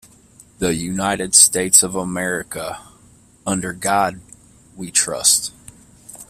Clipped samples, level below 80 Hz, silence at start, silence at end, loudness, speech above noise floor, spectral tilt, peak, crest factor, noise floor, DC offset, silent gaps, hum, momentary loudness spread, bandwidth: under 0.1%; -50 dBFS; 0.6 s; 0.05 s; -16 LUFS; 32 dB; -2 dB/octave; 0 dBFS; 20 dB; -50 dBFS; under 0.1%; none; none; 19 LU; 16 kHz